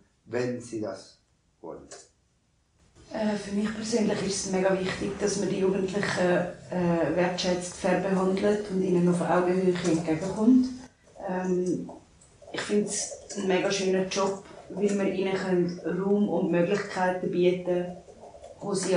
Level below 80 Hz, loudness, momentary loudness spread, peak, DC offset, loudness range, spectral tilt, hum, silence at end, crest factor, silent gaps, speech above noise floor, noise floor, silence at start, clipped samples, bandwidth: -58 dBFS; -27 LUFS; 14 LU; -10 dBFS; under 0.1%; 6 LU; -5.5 dB/octave; none; 0 s; 18 dB; none; 42 dB; -68 dBFS; 0.3 s; under 0.1%; 10.5 kHz